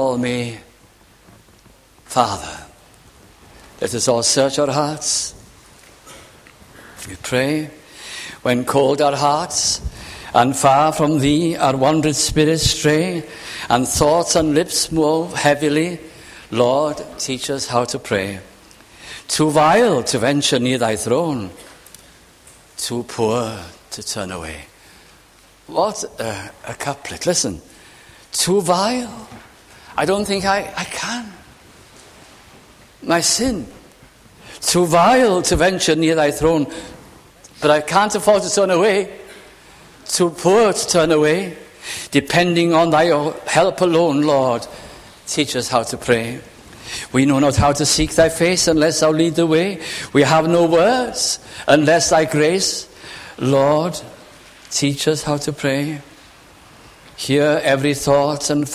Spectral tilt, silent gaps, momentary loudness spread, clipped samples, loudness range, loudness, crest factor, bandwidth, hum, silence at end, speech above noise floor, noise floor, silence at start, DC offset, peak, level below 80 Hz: -4 dB/octave; none; 16 LU; under 0.1%; 8 LU; -17 LUFS; 18 dB; 16 kHz; none; 0 s; 33 dB; -50 dBFS; 0 s; under 0.1%; 0 dBFS; -42 dBFS